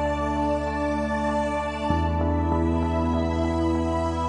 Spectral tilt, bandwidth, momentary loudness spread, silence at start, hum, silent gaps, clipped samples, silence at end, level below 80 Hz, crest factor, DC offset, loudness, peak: -7.5 dB/octave; 10.5 kHz; 2 LU; 0 s; none; none; under 0.1%; 0 s; -36 dBFS; 14 dB; under 0.1%; -25 LUFS; -10 dBFS